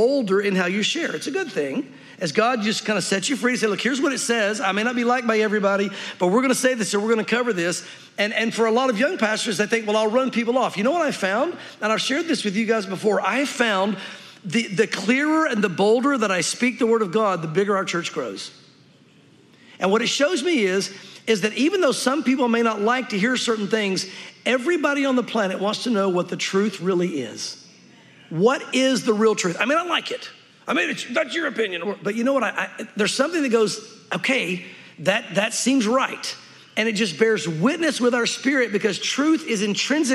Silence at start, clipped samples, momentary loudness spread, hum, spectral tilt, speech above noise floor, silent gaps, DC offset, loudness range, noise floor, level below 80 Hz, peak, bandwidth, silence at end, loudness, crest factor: 0 s; under 0.1%; 8 LU; none; -4 dB/octave; 31 dB; none; under 0.1%; 3 LU; -53 dBFS; -80 dBFS; -4 dBFS; 14 kHz; 0 s; -21 LUFS; 18 dB